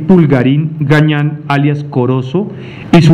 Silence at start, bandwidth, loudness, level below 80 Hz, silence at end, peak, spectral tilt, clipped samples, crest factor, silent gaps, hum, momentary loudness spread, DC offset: 0 s; 8.8 kHz; -11 LUFS; -42 dBFS; 0 s; 0 dBFS; -8 dB/octave; 1%; 10 dB; none; none; 9 LU; under 0.1%